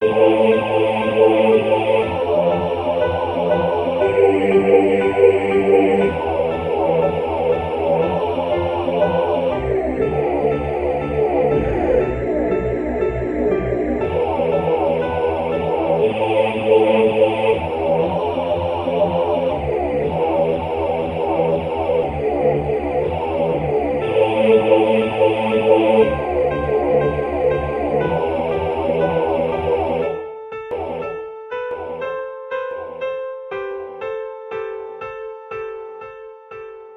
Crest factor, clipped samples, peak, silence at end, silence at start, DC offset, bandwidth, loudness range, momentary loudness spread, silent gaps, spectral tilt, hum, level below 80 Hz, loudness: 18 dB; under 0.1%; 0 dBFS; 0 s; 0 s; under 0.1%; 10 kHz; 11 LU; 14 LU; none; -8 dB/octave; none; -38 dBFS; -18 LUFS